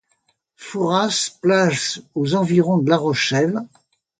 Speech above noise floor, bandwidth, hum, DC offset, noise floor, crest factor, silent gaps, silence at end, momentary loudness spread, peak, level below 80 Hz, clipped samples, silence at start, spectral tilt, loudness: 48 dB; 9.4 kHz; none; under 0.1%; -67 dBFS; 18 dB; none; 0.55 s; 10 LU; -2 dBFS; -62 dBFS; under 0.1%; 0.6 s; -4.5 dB/octave; -19 LUFS